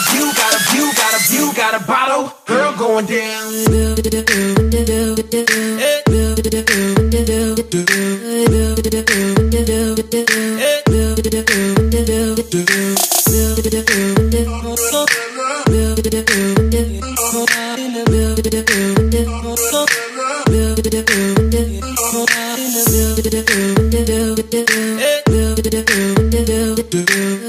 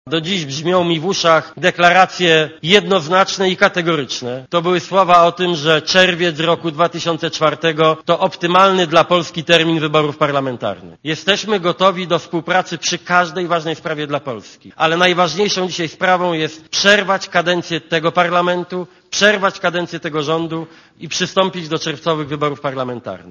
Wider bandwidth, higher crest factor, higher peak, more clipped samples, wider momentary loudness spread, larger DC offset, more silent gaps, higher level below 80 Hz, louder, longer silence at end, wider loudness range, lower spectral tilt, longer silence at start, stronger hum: first, 16 kHz vs 11 kHz; about the same, 14 dB vs 16 dB; about the same, 0 dBFS vs 0 dBFS; neither; second, 4 LU vs 11 LU; neither; neither; first, -24 dBFS vs -58 dBFS; about the same, -14 LUFS vs -15 LUFS; about the same, 0 s vs 0 s; second, 1 LU vs 4 LU; about the same, -4 dB/octave vs -4 dB/octave; about the same, 0 s vs 0.05 s; neither